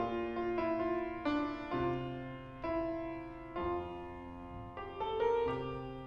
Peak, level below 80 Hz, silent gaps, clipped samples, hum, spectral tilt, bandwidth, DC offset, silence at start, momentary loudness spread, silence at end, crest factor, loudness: -22 dBFS; -56 dBFS; none; under 0.1%; none; -8 dB/octave; 6.6 kHz; under 0.1%; 0 s; 12 LU; 0 s; 16 dB; -38 LUFS